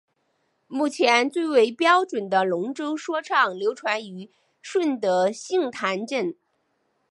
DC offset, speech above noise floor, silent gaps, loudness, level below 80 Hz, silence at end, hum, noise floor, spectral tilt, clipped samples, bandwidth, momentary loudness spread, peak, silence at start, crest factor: under 0.1%; 48 dB; none; -23 LUFS; -80 dBFS; 0.8 s; none; -71 dBFS; -4 dB/octave; under 0.1%; 11.5 kHz; 10 LU; -4 dBFS; 0.7 s; 20 dB